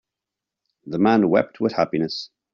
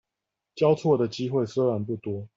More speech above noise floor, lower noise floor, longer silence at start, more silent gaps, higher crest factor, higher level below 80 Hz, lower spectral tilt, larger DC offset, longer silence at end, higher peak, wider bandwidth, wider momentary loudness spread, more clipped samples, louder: first, 66 dB vs 61 dB; about the same, -86 dBFS vs -86 dBFS; first, 0.85 s vs 0.55 s; neither; about the same, 18 dB vs 16 dB; about the same, -62 dBFS vs -66 dBFS; second, -5 dB/octave vs -7.5 dB/octave; neither; first, 0.3 s vs 0.1 s; first, -4 dBFS vs -10 dBFS; second, 7 kHz vs 7.8 kHz; first, 12 LU vs 8 LU; neither; first, -21 LUFS vs -25 LUFS